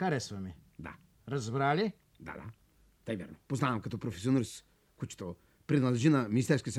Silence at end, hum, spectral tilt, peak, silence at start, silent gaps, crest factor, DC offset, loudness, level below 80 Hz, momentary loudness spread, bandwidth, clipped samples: 0 s; none; -6.5 dB/octave; -14 dBFS; 0 s; none; 20 dB; under 0.1%; -33 LUFS; -64 dBFS; 21 LU; 13 kHz; under 0.1%